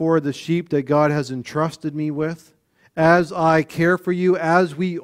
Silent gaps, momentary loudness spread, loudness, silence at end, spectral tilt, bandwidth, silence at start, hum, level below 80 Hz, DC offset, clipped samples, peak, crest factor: none; 10 LU; -20 LUFS; 0 s; -7 dB/octave; 15 kHz; 0 s; none; -58 dBFS; under 0.1%; under 0.1%; -2 dBFS; 18 dB